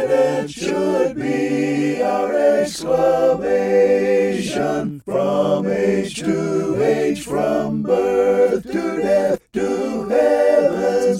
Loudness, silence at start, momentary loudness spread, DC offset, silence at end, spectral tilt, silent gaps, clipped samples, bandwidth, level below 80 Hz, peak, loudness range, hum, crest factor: -18 LUFS; 0 s; 6 LU; under 0.1%; 0 s; -6 dB/octave; none; under 0.1%; 15 kHz; -52 dBFS; -4 dBFS; 2 LU; none; 14 dB